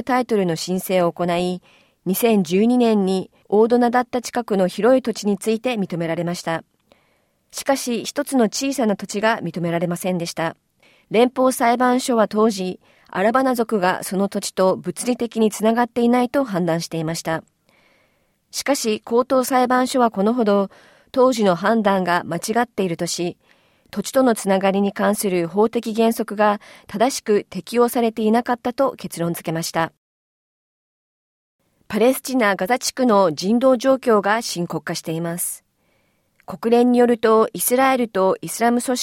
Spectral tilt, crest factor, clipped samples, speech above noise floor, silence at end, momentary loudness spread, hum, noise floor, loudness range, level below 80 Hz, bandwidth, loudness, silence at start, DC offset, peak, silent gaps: -5 dB/octave; 16 dB; under 0.1%; 45 dB; 0 s; 9 LU; none; -64 dBFS; 5 LU; -62 dBFS; 17 kHz; -20 LUFS; 0 s; under 0.1%; -4 dBFS; 29.97-31.59 s